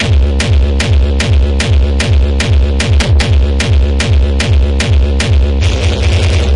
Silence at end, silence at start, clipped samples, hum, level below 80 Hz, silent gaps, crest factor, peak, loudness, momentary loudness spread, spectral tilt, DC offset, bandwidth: 0 s; 0 s; under 0.1%; none; -12 dBFS; none; 8 dB; -2 dBFS; -11 LUFS; 1 LU; -5.5 dB/octave; 1%; 11 kHz